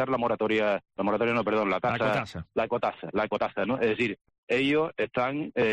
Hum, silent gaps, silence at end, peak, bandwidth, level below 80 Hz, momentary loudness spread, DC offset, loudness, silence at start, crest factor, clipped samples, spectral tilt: none; 4.21-4.25 s, 4.38-4.47 s; 0 s; -16 dBFS; 9.4 kHz; -60 dBFS; 5 LU; under 0.1%; -27 LUFS; 0 s; 12 dB; under 0.1%; -6.5 dB/octave